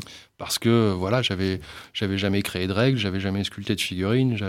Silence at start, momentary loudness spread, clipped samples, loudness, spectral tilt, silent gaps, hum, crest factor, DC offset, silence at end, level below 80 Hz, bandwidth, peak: 0 s; 8 LU; under 0.1%; -24 LUFS; -5.5 dB/octave; none; none; 18 dB; under 0.1%; 0 s; -54 dBFS; 16.5 kHz; -6 dBFS